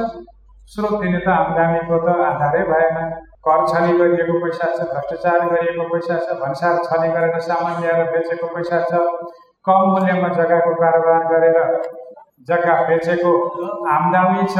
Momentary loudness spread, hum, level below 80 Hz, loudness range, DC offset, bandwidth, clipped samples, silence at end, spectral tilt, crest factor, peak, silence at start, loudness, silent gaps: 9 LU; none; -52 dBFS; 3 LU; under 0.1%; 9 kHz; under 0.1%; 0 s; -8 dB/octave; 16 dB; -2 dBFS; 0 s; -17 LUFS; none